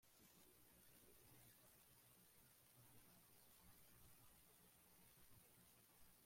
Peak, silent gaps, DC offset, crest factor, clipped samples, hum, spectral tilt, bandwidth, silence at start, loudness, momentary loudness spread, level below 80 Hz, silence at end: -56 dBFS; none; under 0.1%; 14 dB; under 0.1%; 60 Hz at -85 dBFS; -3 dB/octave; 16.5 kHz; 0 s; -69 LUFS; 2 LU; -84 dBFS; 0 s